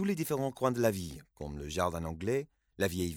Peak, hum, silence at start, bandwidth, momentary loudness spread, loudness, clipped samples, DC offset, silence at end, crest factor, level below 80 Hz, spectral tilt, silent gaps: -14 dBFS; none; 0 s; 19 kHz; 14 LU; -34 LUFS; under 0.1%; under 0.1%; 0 s; 18 dB; -56 dBFS; -5.5 dB/octave; none